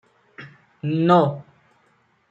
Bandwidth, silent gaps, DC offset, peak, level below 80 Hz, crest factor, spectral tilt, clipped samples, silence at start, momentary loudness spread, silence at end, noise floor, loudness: 7.6 kHz; none; under 0.1%; -4 dBFS; -70 dBFS; 20 dB; -9 dB/octave; under 0.1%; 0.4 s; 26 LU; 0.9 s; -62 dBFS; -20 LUFS